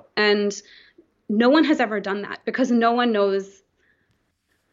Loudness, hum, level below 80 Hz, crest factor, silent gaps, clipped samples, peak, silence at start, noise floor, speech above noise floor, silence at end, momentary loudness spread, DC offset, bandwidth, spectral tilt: -21 LUFS; none; -74 dBFS; 16 dB; none; under 0.1%; -6 dBFS; 0.15 s; -70 dBFS; 49 dB; 1.25 s; 11 LU; under 0.1%; 7.6 kHz; -4.5 dB/octave